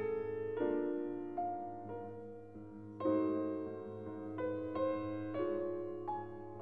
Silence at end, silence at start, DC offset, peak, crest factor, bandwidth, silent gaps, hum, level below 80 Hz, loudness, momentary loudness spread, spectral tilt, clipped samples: 0 s; 0 s; 0.1%; -24 dBFS; 16 dB; 4.6 kHz; none; none; -74 dBFS; -40 LUFS; 12 LU; -10 dB/octave; under 0.1%